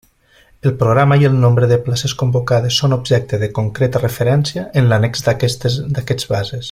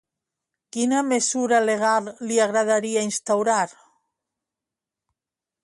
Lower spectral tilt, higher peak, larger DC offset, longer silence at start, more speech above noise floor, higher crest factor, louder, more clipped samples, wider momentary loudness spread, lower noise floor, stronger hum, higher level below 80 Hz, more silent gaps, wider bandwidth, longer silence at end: first, -6 dB/octave vs -3 dB/octave; first, -2 dBFS vs -8 dBFS; neither; about the same, 0.65 s vs 0.75 s; second, 37 dB vs 67 dB; about the same, 14 dB vs 16 dB; first, -15 LUFS vs -22 LUFS; neither; first, 8 LU vs 5 LU; second, -51 dBFS vs -89 dBFS; neither; first, -44 dBFS vs -74 dBFS; neither; first, 15.5 kHz vs 11.5 kHz; second, 0 s vs 1.95 s